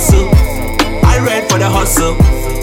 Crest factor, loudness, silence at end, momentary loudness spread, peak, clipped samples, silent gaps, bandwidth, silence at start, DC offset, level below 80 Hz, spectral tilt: 10 dB; -12 LUFS; 0 s; 5 LU; 0 dBFS; under 0.1%; none; 17 kHz; 0 s; under 0.1%; -14 dBFS; -5 dB/octave